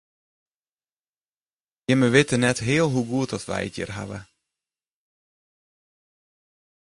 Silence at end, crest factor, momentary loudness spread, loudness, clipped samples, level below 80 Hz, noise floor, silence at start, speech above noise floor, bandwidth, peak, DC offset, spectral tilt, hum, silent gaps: 2.7 s; 24 dB; 16 LU; -22 LUFS; under 0.1%; -56 dBFS; under -90 dBFS; 1.9 s; over 68 dB; 11.5 kHz; -4 dBFS; under 0.1%; -5 dB/octave; none; none